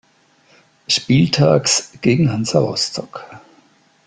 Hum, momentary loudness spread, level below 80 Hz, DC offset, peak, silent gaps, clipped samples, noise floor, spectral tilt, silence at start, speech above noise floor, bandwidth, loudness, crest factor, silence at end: none; 17 LU; -52 dBFS; under 0.1%; -2 dBFS; none; under 0.1%; -55 dBFS; -4.5 dB/octave; 0.9 s; 39 dB; 9.6 kHz; -16 LUFS; 16 dB; 0.7 s